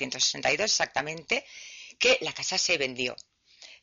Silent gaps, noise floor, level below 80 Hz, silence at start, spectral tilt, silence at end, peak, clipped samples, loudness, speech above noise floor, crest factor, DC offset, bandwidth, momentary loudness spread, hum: none; -53 dBFS; -64 dBFS; 0 s; 0.5 dB/octave; 0.1 s; -12 dBFS; under 0.1%; -26 LUFS; 25 dB; 18 dB; under 0.1%; 7.6 kHz; 18 LU; none